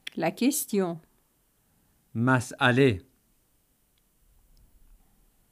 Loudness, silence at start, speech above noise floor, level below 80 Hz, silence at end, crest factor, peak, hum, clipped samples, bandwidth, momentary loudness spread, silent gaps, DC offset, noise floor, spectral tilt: -26 LUFS; 0.15 s; 44 dB; -62 dBFS; 2.5 s; 22 dB; -8 dBFS; none; under 0.1%; 15.5 kHz; 15 LU; none; under 0.1%; -68 dBFS; -5 dB/octave